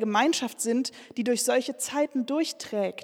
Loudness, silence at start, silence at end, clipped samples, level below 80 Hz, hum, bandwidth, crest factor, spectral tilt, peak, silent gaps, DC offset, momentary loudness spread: -27 LUFS; 0 s; 0 s; under 0.1%; -80 dBFS; none; 18 kHz; 18 dB; -3 dB/octave; -8 dBFS; none; under 0.1%; 6 LU